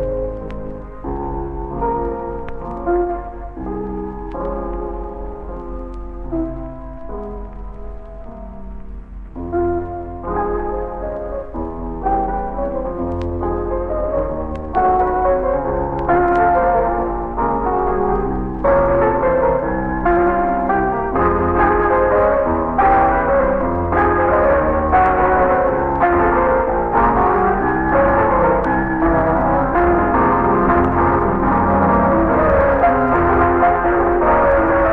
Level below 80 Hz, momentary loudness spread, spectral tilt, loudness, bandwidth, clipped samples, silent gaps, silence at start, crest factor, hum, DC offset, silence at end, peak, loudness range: -28 dBFS; 16 LU; -10.5 dB/octave; -17 LUFS; 4.4 kHz; under 0.1%; none; 0 s; 14 dB; none; under 0.1%; 0 s; -4 dBFS; 13 LU